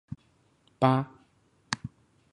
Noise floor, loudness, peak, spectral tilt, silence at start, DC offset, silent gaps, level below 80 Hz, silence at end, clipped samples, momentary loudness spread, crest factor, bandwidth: -66 dBFS; -29 LUFS; -6 dBFS; -6 dB/octave; 0.1 s; under 0.1%; none; -62 dBFS; 0.45 s; under 0.1%; 21 LU; 26 dB; 10.5 kHz